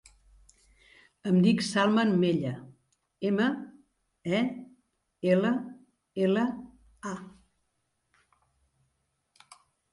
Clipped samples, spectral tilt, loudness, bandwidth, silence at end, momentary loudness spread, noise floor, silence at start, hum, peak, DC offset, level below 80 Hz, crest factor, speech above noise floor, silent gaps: under 0.1%; -6.5 dB/octave; -28 LUFS; 11.5 kHz; 2.65 s; 18 LU; -78 dBFS; 1.25 s; none; -12 dBFS; under 0.1%; -68 dBFS; 20 dB; 51 dB; none